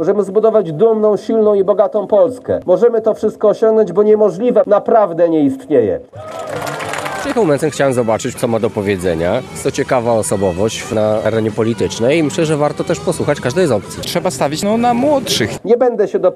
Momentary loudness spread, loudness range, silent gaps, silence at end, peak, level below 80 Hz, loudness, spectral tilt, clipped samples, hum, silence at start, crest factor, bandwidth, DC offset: 7 LU; 4 LU; none; 0 s; 0 dBFS; -50 dBFS; -14 LUFS; -5.5 dB/octave; under 0.1%; none; 0 s; 14 dB; 13.5 kHz; under 0.1%